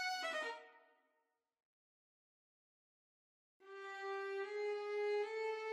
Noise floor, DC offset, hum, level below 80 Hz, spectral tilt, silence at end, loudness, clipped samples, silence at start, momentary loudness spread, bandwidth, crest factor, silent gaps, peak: -86 dBFS; under 0.1%; none; under -90 dBFS; 0.5 dB/octave; 0 s; -43 LUFS; under 0.1%; 0 s; 12 LU; 13.5 kHz; 14 dB; 1.65-3.60 s; -32 dBFS